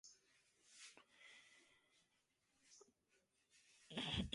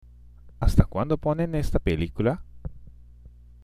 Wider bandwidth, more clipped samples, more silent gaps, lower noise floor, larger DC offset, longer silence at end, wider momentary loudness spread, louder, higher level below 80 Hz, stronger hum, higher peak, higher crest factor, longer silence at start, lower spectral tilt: second, 11.5 kHz vs 15 kHz; neither; neither; first, -85 dBFS vs -48 dBFS; neither; second, 0 s vs 0.35 s; first, 23 LU vs 17 LU; second, -50 LUFS vs -26 LUFS; second, -66 dBFS vs -32 dBFS; second, none vs 60 Hz at -45 dBFS; second, -30 dBFS vs -2 dBFS; about the same, 26 dB vs 24 dB; second, 0.05 s vs 0.45 s; second, -4 dB/octave vs -8 dB/octave